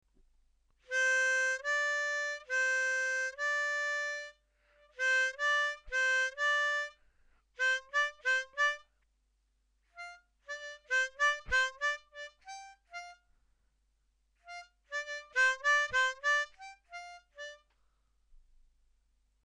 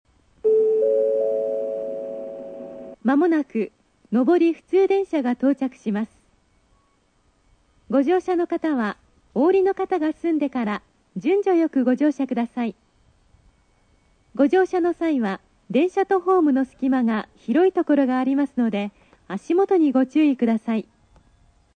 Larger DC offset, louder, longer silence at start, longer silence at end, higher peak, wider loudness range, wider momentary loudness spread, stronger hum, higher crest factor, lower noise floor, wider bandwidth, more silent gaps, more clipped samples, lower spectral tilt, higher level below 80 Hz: neither; second, -31 LUFS vs -21 LUFS; first, 0.9 s vs 0.45 s; first, 1.1 s vs 0.95 s; second, -20 dBFS vs -6 dBFS; about the same, 6 LU vs 4 LU; first, 20 LU vs 12 LU; neither; about the same, 16 dB vs 16 dB; first, -76 dBFS vs -63 dBFS; first, 10.5 kHz vs 9 kHz; neither; neither; second, 2 dB/octave vs -7.5 dB/octave; about the same, -64 dBFS vs -64 dBFS